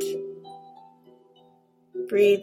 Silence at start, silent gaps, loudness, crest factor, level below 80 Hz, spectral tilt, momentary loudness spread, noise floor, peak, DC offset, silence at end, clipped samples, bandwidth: 0 s; none; -26 LUFS; 18 dB; -76 dBFS; -4.5 dB/octave; 25 LU; -60 dBFS; -10 dBFS; under 0.1%; 0 s; under 0.1%; 16 kHz